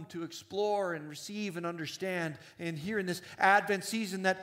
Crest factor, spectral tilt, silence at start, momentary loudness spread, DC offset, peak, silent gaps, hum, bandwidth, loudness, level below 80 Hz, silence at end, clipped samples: 22 dB; -4.5 dB/octave; 0 s; 14 LU; under 0.1%; -12 dBFS; none; none; 16 kHz; -33 LUFS; -78 dBFS; 0 s; under 0.1%